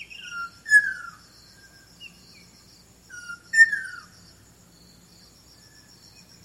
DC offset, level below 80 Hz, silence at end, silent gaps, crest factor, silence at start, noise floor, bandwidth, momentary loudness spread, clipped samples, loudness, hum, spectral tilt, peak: under 0.1%; -64 dBFS; 2.45 s; none; 24 dB; 0 s; -54 dBFS; 16 kHz; 28 LU; under 0.1%; -20 LUFS; none; 0 dB/octave; -4 dBFS